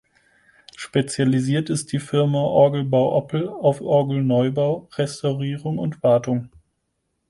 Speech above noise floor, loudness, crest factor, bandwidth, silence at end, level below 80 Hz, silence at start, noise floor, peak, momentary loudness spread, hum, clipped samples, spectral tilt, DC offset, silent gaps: 54 dB; -21 LUFS; 18 dB; 11.5 kHz; 0.8 s; -60 dBFS; 0.8 s; -74 dBFS; -4 dBFS; 9 LU; none; under 0.1%; -6.5 dB/octave; under 0.1%; none